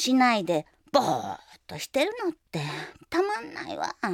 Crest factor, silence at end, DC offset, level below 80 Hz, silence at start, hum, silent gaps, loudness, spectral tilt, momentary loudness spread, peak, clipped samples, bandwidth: 22 dB; 0 s; under 0.1%; -66 dBFS; 0 s; none; none; -28 LUFS; -4 dB/octave; 15 LU; -6 dBFS; under 0.1%; 16.5 kHz